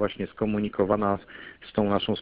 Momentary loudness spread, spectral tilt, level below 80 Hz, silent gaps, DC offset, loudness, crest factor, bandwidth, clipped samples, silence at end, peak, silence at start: 10 LU; -11 dB/octave; -52 dBFS; none; under 0.1%; -27 LUFS; 18 dB; 4.9 kHz; under 0.1%; 0 s; -10 dBFS; 0 s